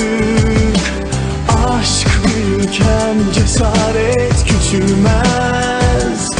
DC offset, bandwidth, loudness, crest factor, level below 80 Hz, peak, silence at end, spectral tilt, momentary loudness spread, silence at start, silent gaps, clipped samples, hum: under 0.1%; 11 kHz; -13 LUFS; 12 dB; -20 dBFS; 0 dBFS; 0 s; -5 dB/octave; 3 LU; 0 s; none; under 0.1%; none